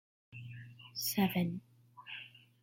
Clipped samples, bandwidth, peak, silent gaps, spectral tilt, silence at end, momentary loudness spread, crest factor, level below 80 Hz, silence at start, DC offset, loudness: under 0.1%; 16.5 kHz; -20 dBFS; none; -4.5 dB/octave; 0.25 s; 22 LU; 18 dB; -74 dBFS; 0.3 s; under 0.1%; -37 LUFS